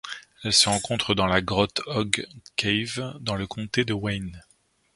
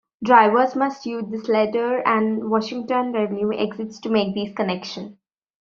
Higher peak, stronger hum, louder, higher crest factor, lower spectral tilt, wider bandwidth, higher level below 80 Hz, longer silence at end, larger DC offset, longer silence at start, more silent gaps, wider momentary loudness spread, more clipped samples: about the same, -2 dBFS vs -2 dBFS; neither; second, -24 LUFS vs -21 LUFS; about the same, 24 dB vs 20 dB; about the same, -3.5 dB/octave vs -4 dB/octave; first, 11.5 kHz vs 7.2 kHz; first, -48 dBFS vs -64 dBFS; about the same, 0.55 s vs 0.5 s; neither; second, 0.05 s vs 0.2 s; neither; about the same, 12 LU vs 13 LU; neither